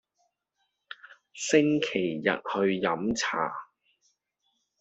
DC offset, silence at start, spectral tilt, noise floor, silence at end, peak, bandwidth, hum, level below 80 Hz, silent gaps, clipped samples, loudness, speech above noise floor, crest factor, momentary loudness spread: under 0.1%; 0.9 s; -4 dB/octave; -79 dBFS; 1.15 s; -8 dBFS; 8.2 kHz; none; -66 dBFS; none; under 0.1%; -27 LUFS; 52 dB; 22 dB; 22 LU